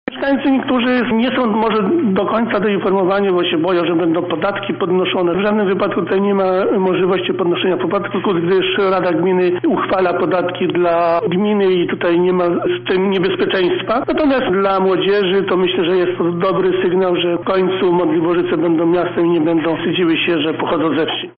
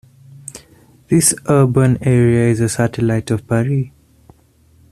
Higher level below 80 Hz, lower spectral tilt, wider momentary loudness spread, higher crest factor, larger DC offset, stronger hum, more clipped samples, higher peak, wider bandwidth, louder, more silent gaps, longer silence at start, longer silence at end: about the same, -50 dBFS vs -46 dBFS; second, -4 dB/octave vs -6 dB/octave; second, 3 LU vs 19 LU; second, 8 dB vs 16 dB; neither; neither; neither; second, -8 dBFS vs 0 dBFS; second, 5.2 kHz vs 14 kHz; about the same, -15 LUFS vs -15 LUFS; neither; second, 0.05 s vs 0.5 s; second, 0.1 s vs 1.05 s